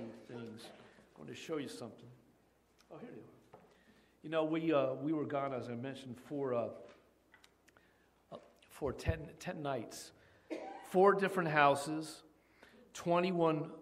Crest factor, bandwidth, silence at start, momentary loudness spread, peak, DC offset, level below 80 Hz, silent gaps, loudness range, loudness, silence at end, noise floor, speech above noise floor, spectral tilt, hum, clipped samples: 26 dB; 15.5 kHz; 0 s; 25 LU; -14 dBFS; under 0.1%; -62 dBFS; none; 15 LU; -36 LUFS; 0 s; -71 dBFS; 35 dB; -6 dB/octave; none; under 0.1%